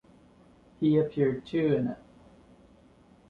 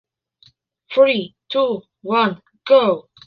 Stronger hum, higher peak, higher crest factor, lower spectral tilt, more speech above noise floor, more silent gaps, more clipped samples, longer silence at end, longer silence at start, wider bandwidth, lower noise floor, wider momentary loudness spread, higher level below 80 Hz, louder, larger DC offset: neither; second, -12 dBFS vs -2 dBFS; about the same, 18 dB vs 18 dB; first, -9.5 dB/octave vs -7 dB/octave; second, 32 dB vs 39 dB; neither; neither; first, 1.35 s vs 0.25 s; about the same, 0.8 s vs 0.9 s; about the same, 5.2 kHz vs 5.2 kHz; about the same, -58 dBFS vs -56 dBFS; about the same, 8 LU vs 9 LU; about the same, -62 dBFS vs -66 dBFS; second, -28 LUFS vs -18 LUFS; neither